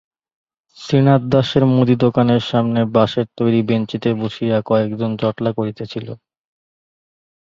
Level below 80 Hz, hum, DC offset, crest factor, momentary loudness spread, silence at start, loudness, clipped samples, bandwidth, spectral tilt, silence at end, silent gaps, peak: -52 dBFS; none; under 0.1%; 16 dB; 12 LU; 0.8 s; -17 LUFS; under 0.1%; 7.4 kHz; -8 dB/octave; 1.3 s; none; -2 dBFS